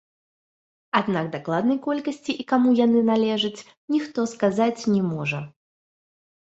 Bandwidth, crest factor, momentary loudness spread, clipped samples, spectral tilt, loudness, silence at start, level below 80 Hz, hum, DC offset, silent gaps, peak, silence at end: 8 kHz; 20 dB; 10 LU; under 0.1%; -6 dB/octave; -23 LUFS; 0.95 s; -66 dBFS; none; under 0.1%; 3.77-3.88 s; -4 dBFS; 1 s